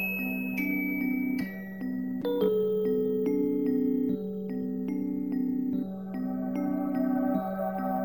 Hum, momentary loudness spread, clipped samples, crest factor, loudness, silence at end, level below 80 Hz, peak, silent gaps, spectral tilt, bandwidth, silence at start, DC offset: none; 6 LU; under 0.1%; 12 dB; -30 LUFS; 0 s; -64 dBFS; -16 dBFS; none; -8.5 dB/octave; 17 kHz; 0 s; 0.1%